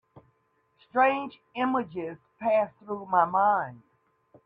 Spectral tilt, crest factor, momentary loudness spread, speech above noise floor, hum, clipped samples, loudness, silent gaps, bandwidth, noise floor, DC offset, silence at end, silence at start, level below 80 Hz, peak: -8 dB/octave; 20 dB; 14 LU; 44 dB; none; under 0.1%; -27 LUFS; none; 5 kHz; -70 dBFS; under 0.1%; 0.65 s; 0.15 s; -72 dBFS; -8 dBFS